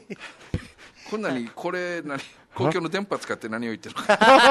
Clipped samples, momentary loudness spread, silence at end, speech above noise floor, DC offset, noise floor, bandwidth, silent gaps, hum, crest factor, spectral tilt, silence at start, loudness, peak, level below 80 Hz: under 0.1%; 16 LU; 0 s; 23 dB; under 0.1%; -46 dBFS; 12.5 kHz; none; none; 22 dB; -4.5 dB/octave; 0.1 s; -24 LUFS; -2 dBFS; -52 dBFS